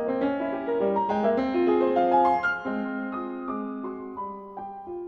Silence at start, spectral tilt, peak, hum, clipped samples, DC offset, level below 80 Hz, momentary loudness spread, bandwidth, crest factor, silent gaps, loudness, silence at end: 0 s; -8 dB/octave; -10 dBFS; none; under 0.1%; under 0.1%; -60 dBFS; 15 LU; 6.4 kHz; 16 dB; none; -26 LUFS; 0 s